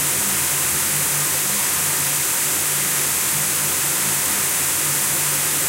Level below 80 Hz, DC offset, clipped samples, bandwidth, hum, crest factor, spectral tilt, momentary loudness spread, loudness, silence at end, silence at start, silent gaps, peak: -54 dBFS; under 0.1%; under 0.1%; 16 kHz; none; 14 dB; -0.5 dB/octave; 0 LU; -17 LUFS; 0 s; 0 s; none; -6 dBFS